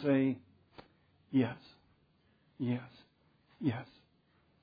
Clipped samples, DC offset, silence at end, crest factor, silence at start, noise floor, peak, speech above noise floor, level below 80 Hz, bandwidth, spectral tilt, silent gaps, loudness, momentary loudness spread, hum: under 0.1%; under 0.1%; 0.8 s; 20 dB; 0 s; -71 dBFS; -18 dBFS; 38 dB; -78 dBFS; 5 kHz; -7 dB/octave; none; -36 LUFS; 19 LU; none